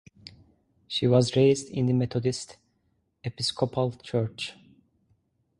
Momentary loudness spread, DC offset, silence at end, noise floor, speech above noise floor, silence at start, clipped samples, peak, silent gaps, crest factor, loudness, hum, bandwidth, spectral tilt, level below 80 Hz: 15 LU; under 0.1%; 1.05 s; -72 dBFS; 47 dB; 0.9 s; under 0.1%; -8 dBFS; none; 20 dB; -26 LUFS; none; 11.5 kHz; -6 dB/octave; -60 dBFS